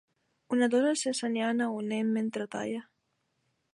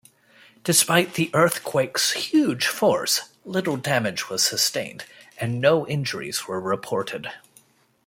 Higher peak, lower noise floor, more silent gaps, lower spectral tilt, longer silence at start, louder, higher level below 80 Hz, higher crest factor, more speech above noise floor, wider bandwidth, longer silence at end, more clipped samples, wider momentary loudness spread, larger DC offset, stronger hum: second, -16 dBFS vs -2 dBFS; first, -78 dBFS vs -58 dBFS; neither; about the same, -4 dB/octave vs -3 dB/octave; second, 0.5 s vs 0.65 s; second, -30 LUFS vs -22 LUFS; second, -82 dBFS vs -66 dBFS; second, 14 dB vs 22 dB; first, 49 dB vs 35 dB; second, 11.5 kHz vs 16.5 kHz; first, 0.9 s vs 0.7 s; neither; second, 9 LU vs 12 LU; neither; neither